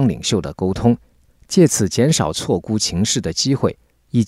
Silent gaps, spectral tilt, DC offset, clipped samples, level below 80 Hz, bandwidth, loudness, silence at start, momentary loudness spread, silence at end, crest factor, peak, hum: none; -5 dB/octave; under 0.1%; under 0.1%; -42 dBFS; 16 kHz; -18 LUFS; 0 s; 7 LU; 0 s; 14 dB; -2 dBFS; none